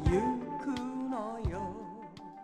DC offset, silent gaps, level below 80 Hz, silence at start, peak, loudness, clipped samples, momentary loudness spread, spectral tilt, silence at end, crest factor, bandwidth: under 0.1%; none; -44 dBFS; 0 s; -16 dBFS; -36 LUFS; under 0.1%; 15 LU; -7.5 dB/octave; 0 s; 18 dB; 11 kHz